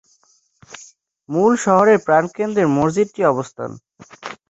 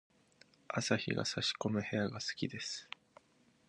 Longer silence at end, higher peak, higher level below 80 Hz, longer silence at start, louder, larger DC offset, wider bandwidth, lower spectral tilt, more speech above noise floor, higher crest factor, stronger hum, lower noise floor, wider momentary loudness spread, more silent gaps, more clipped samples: second, 0.15 s vs 0.85 s; first, -2 dBFS vs -14 dBFS; first, -58 dBFS vs -70 dBFS; about the same, 0.7 s vs 0.7 s; first, -17 LUFS vs -37 LUFS; neither; second, 8.2 kHz vs 11.5 kHz; first, -6 dB/octave vs -4 dB/octave; first, 43 dB vs 33 dB; second, 18 dB vs 24 dB; neither; second, -59 dBFS vs -70 dBFS; first, 22 LU vs 9 LU; neither; neither